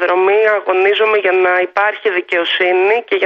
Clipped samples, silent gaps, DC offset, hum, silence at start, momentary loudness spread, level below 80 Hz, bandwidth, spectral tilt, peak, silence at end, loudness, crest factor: under 0.1%; none; under 0.1%; none; 0 s; 4 LU; -68 dBFS; 6 kHz; 1 dB/octave; -2 dBFS; 0 s; -13 LUFS; 12 dB